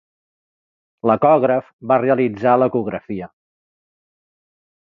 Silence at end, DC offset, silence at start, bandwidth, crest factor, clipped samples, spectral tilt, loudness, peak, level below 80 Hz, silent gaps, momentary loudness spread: 1.6 s; under 0.1%; 1.05 s; 4.8 kHz; 18 dB; under 0.1%; -10 dB/octave; -17 LUFS; -2 dBFS; -60 dBFS; 1.73-1.79 s; 15 LU